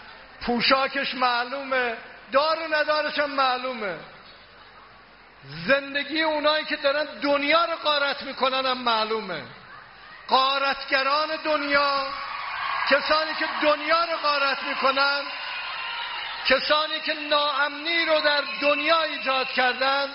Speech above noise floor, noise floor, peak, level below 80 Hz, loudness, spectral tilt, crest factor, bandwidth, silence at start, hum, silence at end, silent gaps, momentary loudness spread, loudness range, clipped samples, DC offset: 26 dB; -50 dBFS; -6 dBFS; -60 dBFS; -23 LUFS; 1 dB/octave; 20 dB; 5.8 kHz; 0 s; none; 0 s; none; 10 LU; 4 LU; under 0.1%; under 0.1%